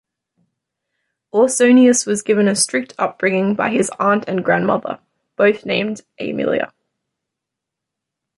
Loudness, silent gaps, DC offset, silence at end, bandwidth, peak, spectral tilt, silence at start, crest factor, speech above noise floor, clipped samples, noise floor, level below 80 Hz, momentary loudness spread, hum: -17 LUFS; none; under 0.1%; 1.7 s; 11.5 kHz; -2 dBFS; -4 dB/octave; 1.35 s; 16 dB; 66 dB; under 0.1%; -82 dBFS; -64 dBFS; 14 LU; none